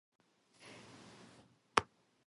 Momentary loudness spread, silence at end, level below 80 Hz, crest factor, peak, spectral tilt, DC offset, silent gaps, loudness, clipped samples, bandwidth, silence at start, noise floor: 24 LU; 0.45 s; -70 dBFS; 38 dB; -6 dBFS; -2.5 dB/octave; under 0.1%; none; -36 LUFS; under 0.1%; 11.5 kHz; 1.75 s; -65 dBFS